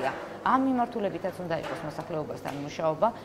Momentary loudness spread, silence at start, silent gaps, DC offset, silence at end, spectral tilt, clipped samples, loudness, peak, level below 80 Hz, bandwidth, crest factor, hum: 10 LU; 0 s; none; under 0.1%; 0 s; -6.5 dB/octave; under 0.1%; -30 LUFS; -10 dBFS; -60 dBFS; 15.5 kHz; 20 dB; none